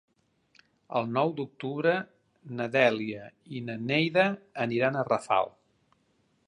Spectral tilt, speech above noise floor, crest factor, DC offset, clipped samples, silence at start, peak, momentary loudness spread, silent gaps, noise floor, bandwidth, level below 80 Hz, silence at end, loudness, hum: -6.5 dB/octave; 42 dB; 22 dB; under 0.1%; under 0.1%; 0.9 s; -8 dBFS; 13 LU; none; -70 dBFS; 11 kHz; -74 dBFS; 1 s; -28 LUFS; none